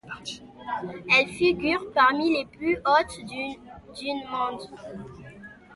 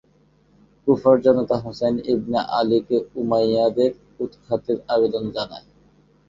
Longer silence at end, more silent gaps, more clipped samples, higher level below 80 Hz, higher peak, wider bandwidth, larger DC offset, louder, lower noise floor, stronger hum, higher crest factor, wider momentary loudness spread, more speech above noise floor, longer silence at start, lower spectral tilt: second, 0 s vs 0.7 s; neither; neither; about the same, -56 dBFS vs -56 dBFS; second, -8 dBFS vs -2 dBFS; first, 11.5 kHz vs 7.4 kHz; neither; second, -25 LUFS vs -21 LUFS; second, -46 dBFS vs -58 dBFS; neither; about the same, 20 dB vs 18 dB; first, 21 LU vs 13 LU; second, 21 dB vs 38 dB; second, 0.05 s vs 0.85 s; second, -4 dB/octave vs -7.5 dB/octave